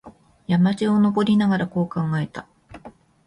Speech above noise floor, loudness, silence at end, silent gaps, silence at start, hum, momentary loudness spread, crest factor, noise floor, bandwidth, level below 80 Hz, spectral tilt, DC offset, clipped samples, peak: 26 dB; -21 LUFS; 0.35 s; none; 0.05 s; none; 12 LU; 14 dB; -46 dBFS; 10.5 kHz; -56 dBFS; -8 dB/octave; under 0.1%; under 0.1%; -8 dBFS